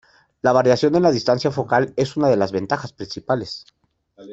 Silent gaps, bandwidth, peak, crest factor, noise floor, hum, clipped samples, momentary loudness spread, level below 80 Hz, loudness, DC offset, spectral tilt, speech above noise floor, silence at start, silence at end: none; 8 kHz; -2 dBFS; 18 dB; -49 dBFS; none; under 0.1%; 13 LU; -56 dBFS; -19 LUFS; under 0.1%; -6 dB/octave; 30 dB; 0.45 s; 0 s